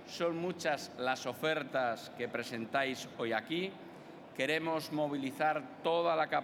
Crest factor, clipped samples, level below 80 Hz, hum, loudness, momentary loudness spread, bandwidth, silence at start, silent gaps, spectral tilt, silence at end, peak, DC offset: 18 dB; under 0.1%; -84 dBFS; none; -35 LUFS; 7 LU; 17.5 kHz; 0 s; none; -4.5 dB/octave; 0 s; -18 dBFS; under 0.1%